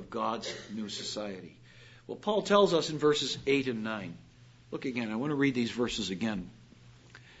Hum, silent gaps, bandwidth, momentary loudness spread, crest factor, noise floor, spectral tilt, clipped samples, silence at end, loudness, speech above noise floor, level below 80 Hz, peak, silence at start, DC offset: none; none; 8 kHz; 19 LU; 22 dB; -56 dBFS; -4.5 dB/octave; under 0.1%; 0.05 s; -31 LUFS; 25 dB; -62 dBFS; -10 dBFS; 0 s; under 0.1%